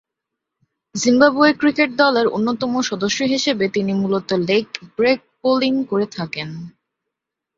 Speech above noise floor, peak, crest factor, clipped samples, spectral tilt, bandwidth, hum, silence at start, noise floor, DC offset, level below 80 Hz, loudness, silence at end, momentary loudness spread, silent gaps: 64 dB; -2 dBFS; 18 dB; under 0.1%; -4.5 dB/octave; 7.8 kHz; none; 0.95 s; -82 dBFS; under 0.1%; -60 dBFS; -18 LUFS; 0.9 s; 12 LU; none